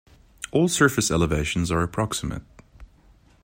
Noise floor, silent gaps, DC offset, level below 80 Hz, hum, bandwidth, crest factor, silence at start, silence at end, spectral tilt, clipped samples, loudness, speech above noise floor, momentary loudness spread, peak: -55 dBFS; none; under 0.1%; -42 dBFS; none; 16 kHz; 20 dB; 0.4 s; 0.6 s; -4.5 dB/octave; under 0.1%; -23 LUFS; 33 dB; 13 LU; -4 dBFS